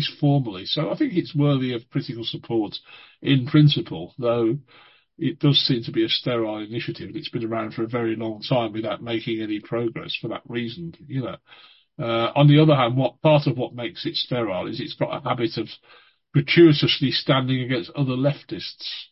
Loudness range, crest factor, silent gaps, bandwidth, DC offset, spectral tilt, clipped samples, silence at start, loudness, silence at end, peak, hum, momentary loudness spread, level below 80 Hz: 6 LU; 20 dB; none; 5.8 kHz; under 0.1%; -10 dB/octave; under 0.1%; 0 s; -22 LUFS; 0.05 s; -4 dBFS; none; 14 LU; -60 dBFS